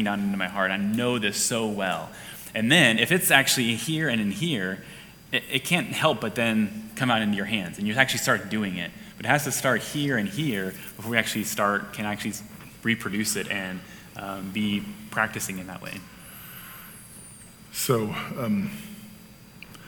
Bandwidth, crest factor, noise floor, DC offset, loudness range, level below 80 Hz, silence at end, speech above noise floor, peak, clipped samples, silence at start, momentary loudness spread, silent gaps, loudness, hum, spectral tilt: 19 kHz; 26 dB; -48 dBFS; under 0.1%; 9 LU; -60 dBFS; 0 s; 22 dB; -2 dBFS; under 0.1%; 0 s; 19 LU; none; -25 LUFS; none; -3.5 dB/octave